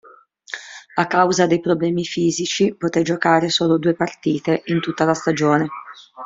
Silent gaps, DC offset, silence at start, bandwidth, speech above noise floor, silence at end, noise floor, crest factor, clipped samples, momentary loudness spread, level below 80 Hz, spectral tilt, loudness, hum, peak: none; under 0.1%; 0.5 s; 7.8 kHz; 28 dB; 0 s; -46 dBFS; 18 dB; under 0.1%; 13 LU; -60 dBFS; -5 dB/octave; -19 LUFS; none; -2 dBFS